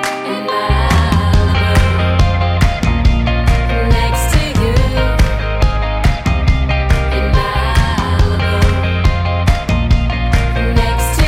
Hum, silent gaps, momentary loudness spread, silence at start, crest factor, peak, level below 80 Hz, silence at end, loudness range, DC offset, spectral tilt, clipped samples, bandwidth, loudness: none; none; 3 LU; 0 s; 12 dB; 0 dBFS; -16 dBFS; 0 s; 1 LU; under 0.1%; -5.5 dB/octave; under 0.1%; 16 kHz; -14 LUFS